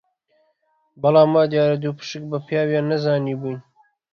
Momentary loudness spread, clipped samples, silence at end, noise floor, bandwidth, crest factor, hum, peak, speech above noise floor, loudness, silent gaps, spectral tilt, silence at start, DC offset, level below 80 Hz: 14 LU; under 0.1%; 0.55 s; -66 dBFS; 7 kHz; 18 dB; none; -4 dBFS; 47 dB; -20 LUFS; none; -7.5 dB/octave; 1 s; under 0.1%; -64 dBFS